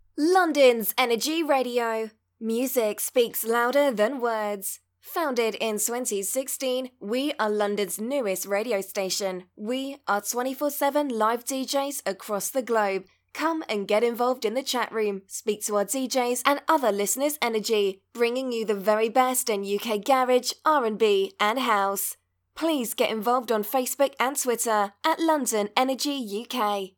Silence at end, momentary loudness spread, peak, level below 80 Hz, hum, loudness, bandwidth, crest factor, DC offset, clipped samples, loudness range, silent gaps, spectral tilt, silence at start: 0.1 s; 8 LU; -4 dBFS; -80 dBFS; none; -25 LUFS; 19 kHz; 22 dB; under 0.1%; under 0.1%; 4 LU; none; -2.5 dB/octave; 0.15 s